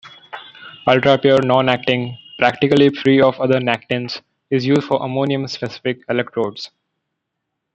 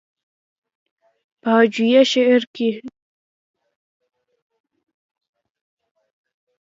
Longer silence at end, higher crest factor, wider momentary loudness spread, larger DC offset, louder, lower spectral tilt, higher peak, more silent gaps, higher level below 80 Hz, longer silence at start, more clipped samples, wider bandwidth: second, 1.05 s vs 3.75 s; about the same, 16 dB vs 20 dB; first, 18 LU vs 11 LU; neither; about the same, -17 LUFS vs -16 LUFS; first, -6.5 dB/octave vs -4.5 dB/octave; about the same, -2 dBFS vs -2 dBFS; second, none vs 2.47-2.54 s; first, -58 dBFS vs -76 dBFS; second, 0.05 s vs 1.45 s; neither; first, 8.4 kHz vs 7.6 kHz